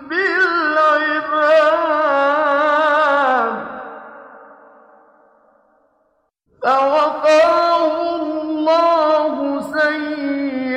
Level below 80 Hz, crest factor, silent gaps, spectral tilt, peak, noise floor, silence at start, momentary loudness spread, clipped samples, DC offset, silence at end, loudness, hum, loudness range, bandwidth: -62 dBFS; 14 dB; none; -3.5 dB/octave; -4 dBFS; -64 dBFS; 0 s; 9 LU; under 0.1%; under 0.1%; 0 s; -16 LUFS; none; 9 LU; 9.4 kHz